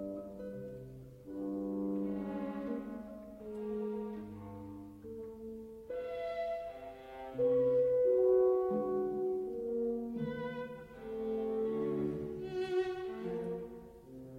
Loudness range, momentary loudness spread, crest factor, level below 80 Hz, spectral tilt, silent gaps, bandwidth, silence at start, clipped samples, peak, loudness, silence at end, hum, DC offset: 11 LU; 19 LU; 16 dB; -64 dBFS; -8.5 dB/octave; none; 7.2 kHz; 0 s; under 0.1%; -20 dBFS; -36 LUFS; 0 s; none; under 0.1%